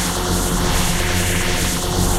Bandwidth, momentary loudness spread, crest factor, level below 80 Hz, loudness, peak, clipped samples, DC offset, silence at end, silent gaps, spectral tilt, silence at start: 16 kHz; 1 LU; 14 dB; -24 dBFS; -18 LUFS; -4 dBFS; under 0.1%; under 0.1%; 0 s; none; -3.5 dB/octave; 0 s